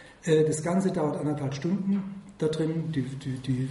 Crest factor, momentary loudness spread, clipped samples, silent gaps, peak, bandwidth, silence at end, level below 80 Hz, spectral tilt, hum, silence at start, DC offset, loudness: 18 dB; 8 LU; under 0.1%; none; -10 dBFS; 11.5 kHz; 0 s; -60 dBFS; -7 dB/octave; none; 0 s; under 0.1%; -28 LUFS